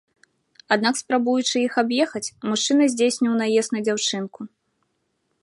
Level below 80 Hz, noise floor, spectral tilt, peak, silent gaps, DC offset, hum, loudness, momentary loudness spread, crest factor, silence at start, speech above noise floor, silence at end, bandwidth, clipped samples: -74 dBFS; -72 dBFS; -3 dB/octave; -2 dBFS; none; under 0.1%; none; -21 LUFS; 10 LU; 20 dB; 0.7 s; 51 dB; 0.95 s; 11.5 kHz; under 0.1%